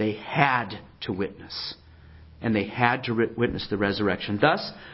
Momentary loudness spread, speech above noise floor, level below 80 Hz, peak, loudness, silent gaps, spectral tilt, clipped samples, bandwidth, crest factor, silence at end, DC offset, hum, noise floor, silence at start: 11 LU; 23 dB; -52 dBFS; -2 dBFS; -26 LUFS; none; -9.5 dB/octave; under 0.1%; 5.8 kHz; 24 dB; 0 s; under 0.1%; none; -49 dBFS; 0 s